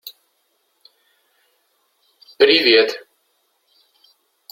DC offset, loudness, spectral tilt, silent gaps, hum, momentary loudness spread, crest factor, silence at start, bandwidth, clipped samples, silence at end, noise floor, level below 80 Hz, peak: under 0.1%; -14 LUFS; -3 dB/octave; none; none; 23 LU; 22 dB; 0.05 s; 16.5 kHz; under 0.1%; 1.55 s; -67 dBFS; -66 dBFS; -2 dBFS